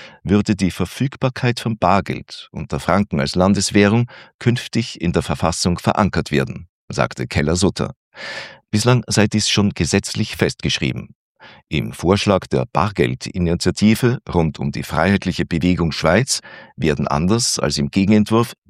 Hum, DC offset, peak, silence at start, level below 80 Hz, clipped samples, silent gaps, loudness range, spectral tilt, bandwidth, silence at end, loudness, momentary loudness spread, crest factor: none; under 0.1%; 0 dBFS; 0 s; -42 dBFS; under 0.1%; 4.34-4.39 s, 6.69-6.88 s, 7.96-8.12 s, 11.15-11.35 s; 2 LU; -5 dB/octave; 15 kHz; 0.15 s; -18 LUFS; 10 LU; 18 dB